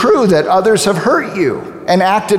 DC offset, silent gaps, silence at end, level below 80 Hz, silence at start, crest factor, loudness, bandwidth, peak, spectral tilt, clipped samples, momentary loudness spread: under 0.1%; none; 0 s; -50 dBFS; 0 s; 12 dB; -12 LUFS; 16 kHz; 0 dBFS; -5 dB/octave; under 0.1%; 6 LU